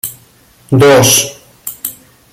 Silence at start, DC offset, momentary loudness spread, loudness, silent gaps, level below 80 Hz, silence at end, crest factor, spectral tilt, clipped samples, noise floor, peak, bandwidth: 0.05 s; under 0.1%; 19 LU; -9 LUFS; none; -46 dBFS; 0.4 s; 12 dB; -3.5 dB/octave; under 0.1%; -45 dBFS; 0 dBFS; 17 kHz